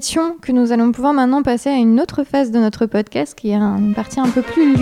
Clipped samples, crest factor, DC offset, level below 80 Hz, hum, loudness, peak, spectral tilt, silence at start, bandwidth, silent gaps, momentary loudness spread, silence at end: under 0.1%; 12 dB; under 0.1%; -46 dBFS; none; -16 LUFS; -2 dBFS; -6 dB/octave; 0 s; 13.5 kHz; none; 5 LU; 0 s